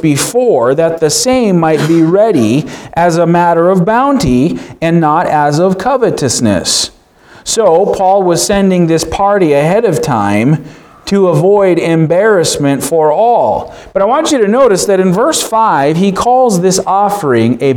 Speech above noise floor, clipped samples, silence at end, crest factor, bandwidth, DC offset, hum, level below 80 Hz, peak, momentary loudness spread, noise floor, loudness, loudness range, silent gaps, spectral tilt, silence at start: 31 dB; under 0.1%; 0 s; 10 dB; 19.5 kHz; under 0.1%; none; -38 dBFS; 0 dBFS; 4 LU; -40 dBFS; -10 LUFS; 1 LU; none; -5 dB/octave; 0 s